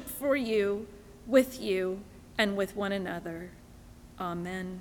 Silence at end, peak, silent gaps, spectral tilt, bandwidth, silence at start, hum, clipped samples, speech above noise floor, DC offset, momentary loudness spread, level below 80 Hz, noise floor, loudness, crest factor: 0 s; -10 dBFS; none; -5 dB/octave; over 20 kHz; 0 s; none; under 0.1%; 21 dB; under 0.1%; 16 LU; -56 dBFS; -51 dBFS; -31 LUFS; 22 dB